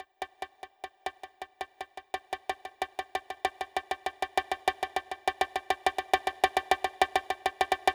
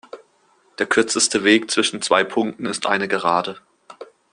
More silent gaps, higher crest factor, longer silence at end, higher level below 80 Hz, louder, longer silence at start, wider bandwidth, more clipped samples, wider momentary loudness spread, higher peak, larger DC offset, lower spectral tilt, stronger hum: neither; about the same, 22 dB vs 20 dB; second, 0 s vs 0.3 s; about the same, -62 dBFS vs -64 dBFS; second, -32 LUFS vs -19 LUFS; second, 0 s vs 0.15 s; first, over 20 kHz vs 10.5 kHz; neither; first, 14 LU vs 8 LU; second, -10 dBFS vs -2 dBFS; neither; about the same, -2 dB/octave vs -2.5 dB/octave; neither